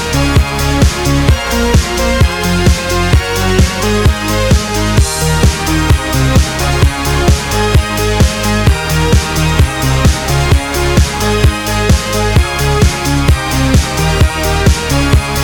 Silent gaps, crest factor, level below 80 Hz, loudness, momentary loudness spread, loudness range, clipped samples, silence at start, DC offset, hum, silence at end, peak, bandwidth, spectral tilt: none; 10 dB; -16 dBFS; -12 LUFS; 1 LU; 0 LU; under 0.1%; 0 s; under 0.1%; none; 0 s; 0 dBFS; 19.5 kHz; -4.5 dB/octave